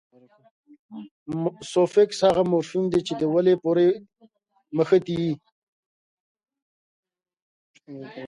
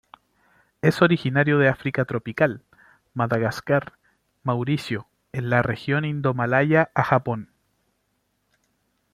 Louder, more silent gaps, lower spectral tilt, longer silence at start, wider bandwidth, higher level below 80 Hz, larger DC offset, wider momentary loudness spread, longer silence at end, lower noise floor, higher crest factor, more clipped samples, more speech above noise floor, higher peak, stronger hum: about the same, -23 LUFS vs -23 LUFS; first, 1.11-1.26 s, 5.52-6.35 s, 6.62-7.03 s, 7.42-7.74 s vs none; about the same, -6.5 dB/octave vs -7.5 dB/octave; about the same, 0.9 s vs 0.85 s; second, 11 kHz vs 14.5 kHz; about the same, -62 dBFS vs -58 dBFS; neither; first, 21 LU vs 13 LU; second, 0 s vs 1.7 s; second, -60 dBFS vs -72 dBFS; about the same, 18 dB vs 22 dB; neither; second, 38 dB vs 50 dB; second, -6 dBFS vs -2 dBFS; second, none vs 50 Hz at -65 dBFS